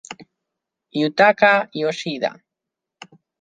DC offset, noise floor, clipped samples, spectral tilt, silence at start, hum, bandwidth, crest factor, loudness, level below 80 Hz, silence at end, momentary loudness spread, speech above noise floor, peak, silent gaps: under 0.1%; -84 dBFS; under 0.1%; -4.5 dB/octave; 0.1 s; none; 9.2 kHz; 20 dB; -18 LUFS; -68 dBFS; 1.1 s; 18 LU; 66 dB; -2 dBFS; none